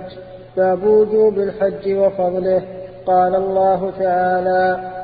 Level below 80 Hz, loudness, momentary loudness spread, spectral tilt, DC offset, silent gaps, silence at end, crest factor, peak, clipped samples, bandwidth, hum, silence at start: -50 dBFS; -17 LUFS; 9 LU; -11 dB/octave; under 0.1%; none; 0 s; 12 dB; -4 dBFS; under 0.1%; 4.9 kHz; none; 0 s